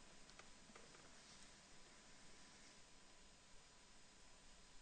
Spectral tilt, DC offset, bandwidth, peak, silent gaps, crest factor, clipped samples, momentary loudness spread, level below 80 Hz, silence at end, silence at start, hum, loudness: -2 dB/octave; under 0.1%; 9 kHz; -44 dBFS; none; 20 dB; under 0.1%; 4 LU; -72 dBFS; 0 s; 0 s; none; -64 LUFS